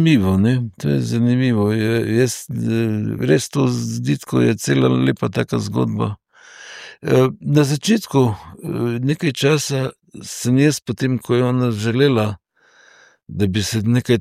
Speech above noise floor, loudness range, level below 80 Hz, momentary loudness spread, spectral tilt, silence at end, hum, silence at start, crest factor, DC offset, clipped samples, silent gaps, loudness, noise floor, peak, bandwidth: 35 dB; 1 LU; -54 dBFS; 9 LU; -6 dB/octave; 0 s; none; 0 s; 16 dB; under 0.1%; under 0.1%; none; -18 LUFS; -52 dBFS; -2 dBFS; 15.5 kHz